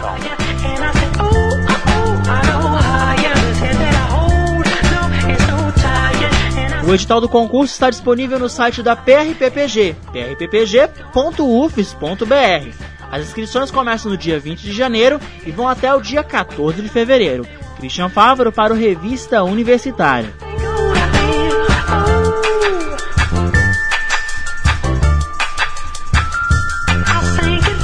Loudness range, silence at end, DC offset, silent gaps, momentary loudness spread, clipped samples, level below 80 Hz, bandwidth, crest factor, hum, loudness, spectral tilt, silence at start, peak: 3 LU; 0 s; under 0.1%; none; 8 LU; under 0.1%; -22 dBFS; 10.5 kHz; 14 dB; none; -15 LUFS; -5.5 dB/octave; 0 s; 0 dBFS